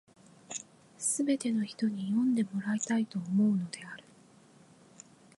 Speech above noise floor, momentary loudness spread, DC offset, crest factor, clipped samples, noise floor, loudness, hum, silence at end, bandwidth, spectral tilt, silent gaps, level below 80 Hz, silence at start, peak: 29 dB; 13 LU; under 0.1%; 14 dB; under 0.1%; -59 dBFS; -31 LUFS; none; 1.4 s; 11.5 kHz; -5 dB/octave; none; -80 dBFS; 0.5 s; -18 dBFS